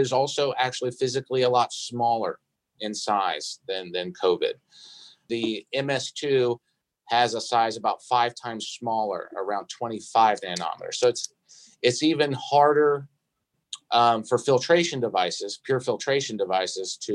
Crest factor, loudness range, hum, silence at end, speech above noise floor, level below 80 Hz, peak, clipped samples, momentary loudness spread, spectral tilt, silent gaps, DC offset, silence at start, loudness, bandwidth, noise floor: 20 dB; 5 LU; none; 0 s; 53 dB; -76 dBFS; -6 dBFS; under 0.1%; 11 LU; -4 dB/octave; none; under 0.1%; 0 s; -25 LUFS; 11.5 kHz; -78 dBFS